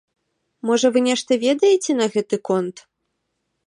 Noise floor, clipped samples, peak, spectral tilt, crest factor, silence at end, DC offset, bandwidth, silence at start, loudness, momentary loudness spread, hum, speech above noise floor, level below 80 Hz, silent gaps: -75 dBFS; under 0.1%; -4 dBFS; -4 dB/octave; 16 dB; 0.85 s; under 0.1%; 11.5 kHz; 0.65 s; -19 LUFS; 7 LU; none; 56 dB; -76 dBFS; none